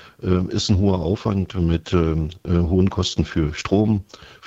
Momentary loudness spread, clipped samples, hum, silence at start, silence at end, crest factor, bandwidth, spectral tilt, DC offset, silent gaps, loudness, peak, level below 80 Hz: 4 LU; under 0.1%; none; 0 s; 0 s; 16 dB; 8 kHz; -6.5 dB/octave; under 0.1%; none; -21 LUFS; -4 dBFS; -38 dBFS